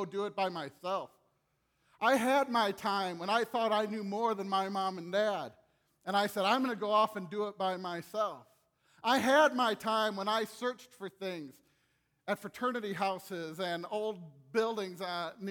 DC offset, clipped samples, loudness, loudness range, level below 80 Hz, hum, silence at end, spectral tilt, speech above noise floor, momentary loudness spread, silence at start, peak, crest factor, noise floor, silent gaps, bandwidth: under 0.1%; under 0.1%; -33 LUFS; 6 LU; -82 dBFS; none; 0 s; -4 dB/octave; 44 dB; 12 LU; 0 s; -14 dBFS; 20 dB; -77 dBFS; none; over 20 kHz